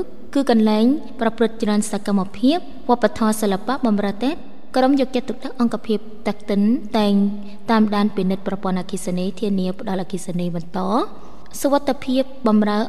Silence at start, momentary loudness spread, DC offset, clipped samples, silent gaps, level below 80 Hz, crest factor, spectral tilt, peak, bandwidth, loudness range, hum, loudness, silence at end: 0 s; 8 LU; 4%; under 0.1%; none; -52 dBFS; 18 dB; -6 dB/octave; -4 dBFS; 13.5 kHz; 4 LU; none; -20 LUFS; 0 s